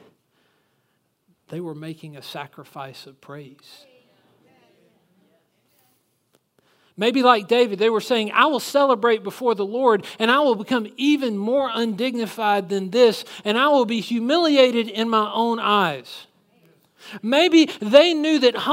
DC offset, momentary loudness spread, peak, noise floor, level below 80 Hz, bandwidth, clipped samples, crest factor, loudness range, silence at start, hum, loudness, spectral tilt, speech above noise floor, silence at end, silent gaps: under 0.1%; 21 LU; 0 dBFS; -69 dBFS; -76 dBFS; 16 kHz; under 0.1%; 22 dB; 18 LU; 1.5 s; none; -19 LUFS; -4.5 dB/octave; 50 dB; 0 s; none